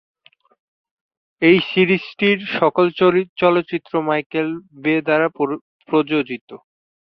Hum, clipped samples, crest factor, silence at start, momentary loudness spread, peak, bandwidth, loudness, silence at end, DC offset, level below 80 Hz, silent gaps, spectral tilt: none; under 0.1%; 18 dB; 1.4 s; 9 LU; -2 dBFS; 5.8 kHz; -18 LUFS; 0.5 s; under 0.1%; -62 dBFS; 3.29-3.36 s, 4.26-4.30 s, 5.61-5.79 s, 6.41-6.48 s; -8.5 dB/octave